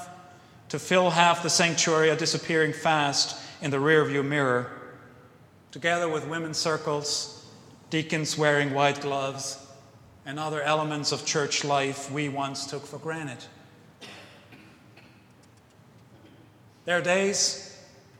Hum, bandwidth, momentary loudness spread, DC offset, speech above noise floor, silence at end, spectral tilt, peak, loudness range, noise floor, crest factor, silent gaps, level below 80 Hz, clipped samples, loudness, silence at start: none; 15.5 kHz; 19 LU; under 0.1%; 30 dB; 0.35 s; -3 dB/octave; -2 dBFS; 12 LU; -56 dBFS; 26 dB; none; -72 dBFS; under 0.1%; -25 LUFS; 0 s